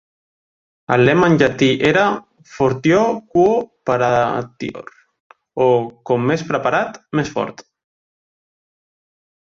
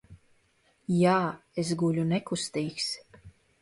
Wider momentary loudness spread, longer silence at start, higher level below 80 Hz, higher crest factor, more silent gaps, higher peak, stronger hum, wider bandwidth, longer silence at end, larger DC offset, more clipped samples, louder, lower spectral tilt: first, 13 LU vs 9 LU; first, 0.9 s vs 0.1 s; first, -52 dBFS vs -64 dBFS; about the same, 18 dB vs 18 dB; first, 5.20-5.30 s vs none; first, -2 dBFS vs -12 dBFS; neither; second, 7.6 kHz vs 11.5 kHz; first, 1.85 s vs 0.3 s; neither; neither; first, -17 LUFS vs -29 LUFS; about the same, -6.5 dB/octave vs -5.5 dB/octave